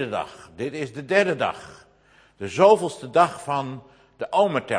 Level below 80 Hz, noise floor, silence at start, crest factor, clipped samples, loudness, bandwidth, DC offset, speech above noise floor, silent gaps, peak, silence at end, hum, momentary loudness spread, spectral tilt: -64 dBFS; -57 dBFS; 0 s; 20 dB; under 0.1%; -22 LUFS; 10.5 kHz; under 0.1%; 34 dB; none; -2 dBFS; 0 s; none; 19 LU; -5 dB/octave